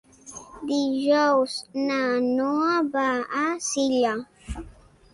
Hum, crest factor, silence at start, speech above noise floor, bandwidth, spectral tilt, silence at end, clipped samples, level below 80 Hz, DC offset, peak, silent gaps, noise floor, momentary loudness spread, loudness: none; 14 dB; 0.25 s; 26 dB; 11.5 kHz; -3.5 dB/octave; 0.45 s; under 0.1%; -48 dBFS; under 0.1%; -10 dBFS; none; -49 dBFS; 17 LU; -24 LUFS